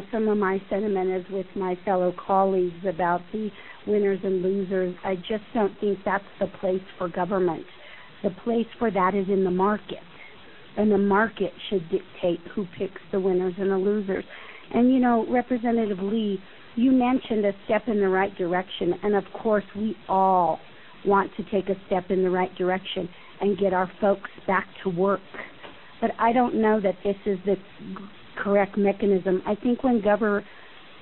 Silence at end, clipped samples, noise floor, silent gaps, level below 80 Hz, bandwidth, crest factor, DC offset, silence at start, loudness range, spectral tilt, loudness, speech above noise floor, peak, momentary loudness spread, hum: 0.4 s; under 0.1%; -48 dBFS; none; -56 dBFS; 4.3 kHz; 16 dB; 0.4%; 0 s; 3 LU; -11 dB/octave; -25 LUFS; 24 dB; -8 dBFS; 11 LU; none